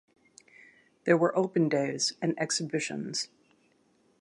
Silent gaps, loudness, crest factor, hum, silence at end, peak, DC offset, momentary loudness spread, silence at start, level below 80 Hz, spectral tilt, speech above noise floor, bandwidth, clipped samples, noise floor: none; -29 LUFS; 22 dB; none; 0.95 s; -10 dBFS; under 0.1%; 9 LU; 1.05 s; -80 dBFS; -4 dB/octave; 39 dB; 11.5 kHz; under 0.1%; -68 dBFS